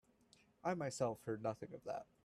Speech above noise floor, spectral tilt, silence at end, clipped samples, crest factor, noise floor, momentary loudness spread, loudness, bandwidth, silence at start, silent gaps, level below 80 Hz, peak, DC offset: 29 dB; -5.5 dB/octave; 0.2 s; under 0.1%; 20 dB; -72 dBFS; 7 LU; -44 LUFS; 14 kHz; 0.65 s; none; -78 dBFS; -26 dBFS; under 0.1%